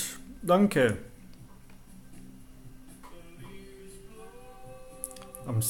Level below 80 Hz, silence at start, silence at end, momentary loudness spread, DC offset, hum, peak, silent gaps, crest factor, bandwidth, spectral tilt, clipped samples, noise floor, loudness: -54 dBFS; 0 s; 0 s; 28 LU; under 0.1%; none; -12 dBFS; none; 22 dB; 17 kHz; -5 dB/octave; under 0.1%; -49 dBFS; -28 LUFS